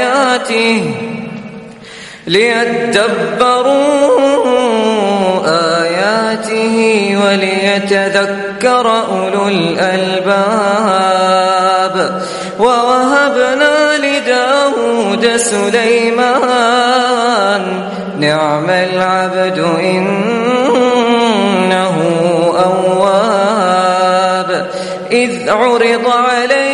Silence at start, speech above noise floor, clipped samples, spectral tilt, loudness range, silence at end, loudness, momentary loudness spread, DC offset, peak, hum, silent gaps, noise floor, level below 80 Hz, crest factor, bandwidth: 0 s; 20 dB; under 0.1%; -4 dB/octave; 2 LU; 0 s; -11 LUFS; 5 LU; under 0.1%; 0 dBFS; none; none; -31 dBFS; -54 dBFS; 12 dB; 11.5 kHz